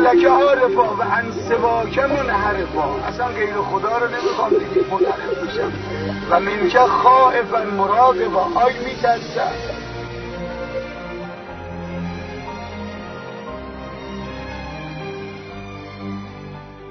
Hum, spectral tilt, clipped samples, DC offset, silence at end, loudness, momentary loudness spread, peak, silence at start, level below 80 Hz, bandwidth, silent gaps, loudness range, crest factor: none; -6 dB/octave; under 0.1%; under 0.1%; 0 s; -18 LUFS; 18 LU; 0 dBFS; 0 s; -42 dBFS; 6.4 kHz; none; 15 LU; 20 dB